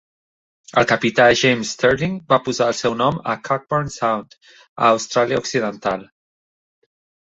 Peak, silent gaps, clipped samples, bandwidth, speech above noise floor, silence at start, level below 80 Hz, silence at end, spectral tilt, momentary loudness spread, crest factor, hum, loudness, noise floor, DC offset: -2 dBFS; 4.69-4.76 s; under 0.1%; 8.2 kHz; over 71 dB; 0.75 s; -52 dBFS; 1.25 s; -4.5 dB/octave; 9 LU; 18 dB; none; -18 LUFS; under -90 dBFS; under 0.1%